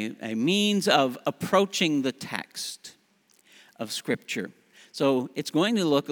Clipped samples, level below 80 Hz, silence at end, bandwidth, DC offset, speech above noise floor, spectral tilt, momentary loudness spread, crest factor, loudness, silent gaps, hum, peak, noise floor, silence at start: under 0.1%; -76 dBFS; 0 s; over 20 kHz; under 0.1%; 38 dB; -4 dB/octave; 13 LU; 22 dB; -26 LUFS; none; none; -6 dBFS; -64 dBFS; 0 s